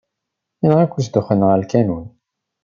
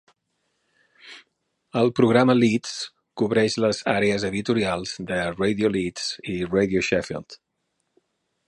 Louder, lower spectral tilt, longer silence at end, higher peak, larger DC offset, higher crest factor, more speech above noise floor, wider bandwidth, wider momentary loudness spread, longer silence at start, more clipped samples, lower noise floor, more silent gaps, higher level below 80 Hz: first, -17 LUFS vs -23 LUFS; first, -8.5 dB/octave vs -5.5 dB/octave; second, 0.55 s vs 1.15 s; about the same, -2 dBFS vs -4 dBFS; neither; about the same, 16 dB vs 20 dB; first, 64 dB vs 53 dB; second, 7.2 kHz vs 11.5 kHz; second, 6 LU vs 15 LU; second, 0.65 s vs 1.05 s; neither; about the same, -79 dBFS vs -76 dBFS; neither; about the same, -54 dBFS vs -54 dBFS